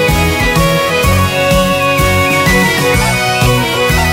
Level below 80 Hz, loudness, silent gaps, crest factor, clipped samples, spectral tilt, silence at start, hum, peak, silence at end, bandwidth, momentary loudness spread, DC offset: -22 dBFS; -10 LUFS; none; 10 dB; under 0.1%; -4.5 dB/octave; 0 s; none; 0 dBFS; 0 s; 16.5 kHz; 2 LU; under 0.1%